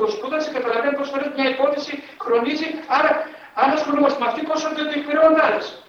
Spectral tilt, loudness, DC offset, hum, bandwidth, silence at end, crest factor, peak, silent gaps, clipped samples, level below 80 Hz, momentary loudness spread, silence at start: -3.5 dB/octave; -20 LUFS; under 0.1%; none; 7.2 kHz; 0.05 s; 18 dB; -2 dBFS; none; under 0.1%; -66 dBFS; 8 LU; 0 s